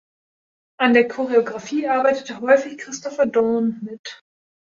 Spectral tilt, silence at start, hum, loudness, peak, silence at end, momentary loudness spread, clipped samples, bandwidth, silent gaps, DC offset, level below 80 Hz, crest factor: -4.5 dB/octave; 0.8 s; none; -19 LUFS; -2 dBFS; 0.55 s; 15 LU; under 0.1%; 7.6 kHz; 3.99-4.04 s; under 0.1%; -66 dBFS; 18 dB